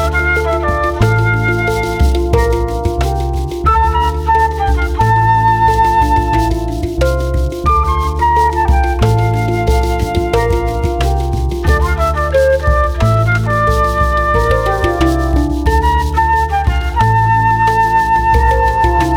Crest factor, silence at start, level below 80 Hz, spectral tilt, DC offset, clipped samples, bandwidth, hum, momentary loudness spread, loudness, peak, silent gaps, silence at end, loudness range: 12 dB; 0 s; -18 dBFS; -6.5 dB/octave; under 0.1%; under 0.1%; 16 kHz; none; 5 LU; -13 LUFS; 0 dBFS; none; 0 s; 2 LU